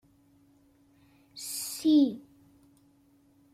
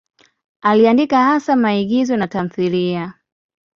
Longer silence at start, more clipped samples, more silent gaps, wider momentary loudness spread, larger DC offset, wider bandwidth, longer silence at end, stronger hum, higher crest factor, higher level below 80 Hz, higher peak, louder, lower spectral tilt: first, 1.35 s vs 0.65 s; neither; neither; first, 22 LU vs 9 LU; neither; first, 16 kHz vs 7.2 kHz; first, 1.35 s vs 0.65 s; neither; about the same, 18 dB vs 14 dB; second, -74 dBFS vs -58 dBFS; second, -14 dBFS vs -2 dBFS; second, -28 LUFS vs -16 LUFS; second, -3.5 dB/octave vs -6.5 dB/octave